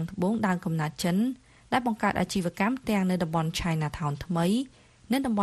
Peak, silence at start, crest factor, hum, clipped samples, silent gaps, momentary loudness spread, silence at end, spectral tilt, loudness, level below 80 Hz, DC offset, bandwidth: -8 dBFS; 0 s; 20 dB; none; under 0.1%; none; 4 LU; 0 s; -6 dB/octave; -28 LUFS; -50 dBFS; under 0.1%; 13.5 kHz